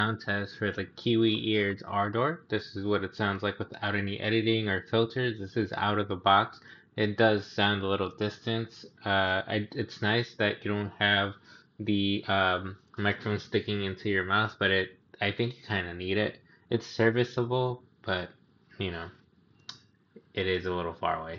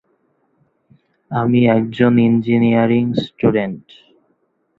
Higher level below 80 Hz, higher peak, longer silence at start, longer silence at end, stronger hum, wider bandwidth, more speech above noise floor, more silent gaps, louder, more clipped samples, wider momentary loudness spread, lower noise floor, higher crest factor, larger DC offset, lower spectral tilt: second, -64 dBFS vs -52 dBFS; second, -8 dBFS vs 0 dBFS; second, 0 s vs 1.3 s; second, 0 s vs 1 s; neither; first, 7.2 kHz vs 4.7 kHz; second, 33 dB vs 49 dB; neither; second, -29 LUFS vs -16 LUFS; neither; about the same, 10 LU vs 9 LU; about the same, -63 dBFS vs -64 dBFS; first, 22 dB vs 16 dB; neither; second, -3.5 dB/octave vs -9.5 dB/octave